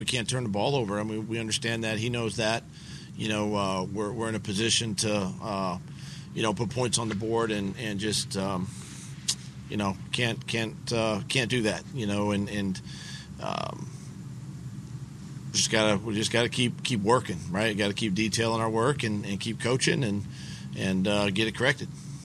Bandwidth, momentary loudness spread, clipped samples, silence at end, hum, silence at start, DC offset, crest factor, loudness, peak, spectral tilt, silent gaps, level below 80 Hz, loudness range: 13 kHz; 15 LU; under 0.1%; 0 s; none; 0 s; under 0.1%; 22 dB; -28 LUFS; -6 dBFS; -4 dB/octave; none; -56 dBFS; 4 LU